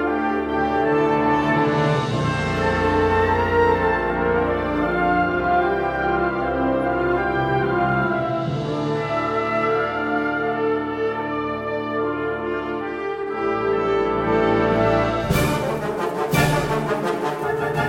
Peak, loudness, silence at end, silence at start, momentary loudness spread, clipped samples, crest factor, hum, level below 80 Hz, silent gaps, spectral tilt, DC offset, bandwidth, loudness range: -6 dBFS; -21 LUFS; 0 s; 0 s; 6 LU; under 0.1%; 14 dB; none; -40 dBFS; none; -6.5 dB/octave; under 0.1%; 16.5 kHz; 4 LU